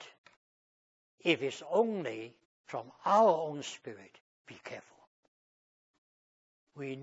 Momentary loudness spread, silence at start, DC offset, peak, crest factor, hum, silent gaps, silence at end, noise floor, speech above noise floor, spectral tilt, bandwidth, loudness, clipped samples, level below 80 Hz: 23 LU; 0 s; under 0.1%; -12 dBFS; 24 dB; none; 0.18-0.24 s, 0.37-1.18 s, 2.45-2.64 s, 4.20-4.45 s, 5.07-6.67 s; 0 s; under -90 dBFS; over 58 dB; -3 dB/octave; 7.6 kHz; -32 LUFS; under 0.1%; under -90 dBFS